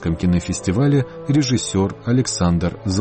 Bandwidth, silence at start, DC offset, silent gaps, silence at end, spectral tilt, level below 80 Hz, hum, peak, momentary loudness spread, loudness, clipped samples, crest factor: 8.8 kHz; 0 s; under 0.1%; none; 0 s; -6 dB/octave; -38 dBFS; none; -6 dBFS; 4 LU; -19 LUFS; under 0.1%; 12 dB